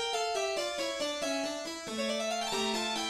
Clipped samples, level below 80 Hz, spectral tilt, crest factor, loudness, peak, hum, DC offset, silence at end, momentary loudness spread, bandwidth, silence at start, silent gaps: under 0.1%; -66 dBFS; -1.5 dB/octave; 14 dB; -33 LUFS; -20 dBFS; none; under 0.1%; 0 s; 4 LU; 16 kHz; 0 s; none